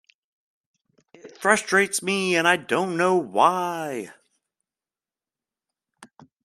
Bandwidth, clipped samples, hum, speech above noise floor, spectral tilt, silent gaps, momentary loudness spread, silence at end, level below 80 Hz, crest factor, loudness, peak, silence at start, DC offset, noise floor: 14 kHz; under 0.1%; none; over 68 dB; -3.5 dB/octave; none; 11 LU; 0.4 s; -74 dBFS; 24 dB; -22 LUFS; -2 dBFS; 1.25 s; under 0.1%; under -90 dBFS